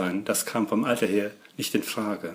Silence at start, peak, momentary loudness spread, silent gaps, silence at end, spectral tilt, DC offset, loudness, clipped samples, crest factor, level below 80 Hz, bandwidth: 0 s; -10 dBFS; 6 LU; none; 0 s; -4 dB/octave; under 0.1%; -27 LUFS; under 0.1%; 18 dB; -72 dBFS; 16 kHz